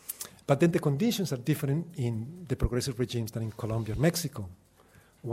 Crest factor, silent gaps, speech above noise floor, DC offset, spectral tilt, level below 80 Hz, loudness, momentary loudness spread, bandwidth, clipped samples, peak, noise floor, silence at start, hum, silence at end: 22 dB; none; 30 dB; under 0.1%; -6 dB/octave; -44 dBFS; -30 LUFS; 12 LU; 16 kHz; under 0.1%; -8 dBFS; -59 dBFS; 0.1 s; none; 0 s